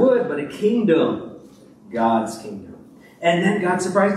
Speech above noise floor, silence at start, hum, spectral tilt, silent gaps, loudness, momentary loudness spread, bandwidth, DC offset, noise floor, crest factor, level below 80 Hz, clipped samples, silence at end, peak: 27 dB; 0 s; none; -6 dB/octave; none; -20 LUFS; 16 LU; 13 kHz; under 0.1%; -46 dBFS; 16 dB; -64 dBFS; under 0.1%; 0 s; -4 dBFS